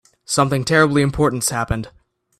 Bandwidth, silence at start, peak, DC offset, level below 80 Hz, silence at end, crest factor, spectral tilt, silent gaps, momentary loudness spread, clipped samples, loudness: 15.5 kHz; 0.3 s; -2 dBFS; under 0.1%; -38 dBFS; 0.5 s; 18 dB; -4.5 dB/octave; none; 10 LU; under 0.1%; -18 LUFS